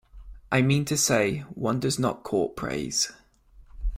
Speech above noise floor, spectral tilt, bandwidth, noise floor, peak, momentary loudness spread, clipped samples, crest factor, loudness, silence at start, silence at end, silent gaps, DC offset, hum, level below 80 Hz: 28 dB; -4 dB/octave; 16 kHz; -54 dBFS; -8 dBFS; 7 LU; under 0.1%; 20 dB; -26 LUFS; 0.15 s; 0 s; none; under 0.1%; none; -40 dBFS